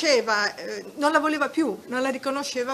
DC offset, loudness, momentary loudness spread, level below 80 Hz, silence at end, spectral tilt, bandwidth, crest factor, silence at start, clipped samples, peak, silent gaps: under 0.1%; -25 LUFS; 7 LU; -72 dBFS; 0 s; -2.5 dB/octave; 14.5 kHz; 20 dB; 0 s; under 0.1%; -4 dBFS; none